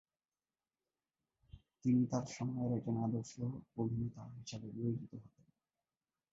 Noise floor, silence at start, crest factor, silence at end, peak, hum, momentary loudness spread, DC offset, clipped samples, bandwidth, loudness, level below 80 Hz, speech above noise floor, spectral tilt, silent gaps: under -90 dBFS; 1.55 s; 18 dB; 1.05 s; -24 dBFS; none; 14 LU; under 0.1%; under 0.1%; 7.6 kHz; -40 LUFS; -68 dBFS; over 51 dB; -8.5 dB/octave; none